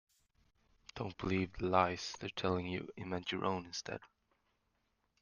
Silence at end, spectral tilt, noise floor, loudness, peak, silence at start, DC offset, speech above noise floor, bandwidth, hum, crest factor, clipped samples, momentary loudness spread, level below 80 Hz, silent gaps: 1.15 s; -5 dB/octave; -81 dBFS; -38 LUFS; -14 dBFS; 0.95 s; under 0.1%; 43 dB; 10 kHz; none; 26 dB; under 0.1%; 13 LU; -64 dBFS; none